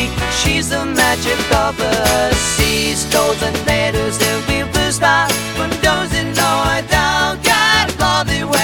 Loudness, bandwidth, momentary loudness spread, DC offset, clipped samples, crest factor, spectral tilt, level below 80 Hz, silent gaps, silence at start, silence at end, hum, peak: -14 LUFS; 19.5 kHz; 4 LU; under 0.1%; under 0.1%; 14 dB; -3 dB/octave; -30 dBFS; none; 0 s; 0 s; none; 0 dBFS